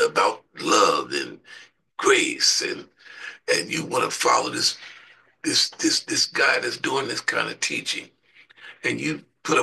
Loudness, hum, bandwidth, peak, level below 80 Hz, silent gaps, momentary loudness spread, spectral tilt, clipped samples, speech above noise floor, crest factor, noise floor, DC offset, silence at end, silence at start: -22 LUFS; none; 12.5 kHz; -4 dBFS; -72 dBFS; none; 15 LU; -1.5 dB/octave; under 0.1%; 30 dB; 20 dB; -53 dBFS; under 0.1%; 0 s; 0 s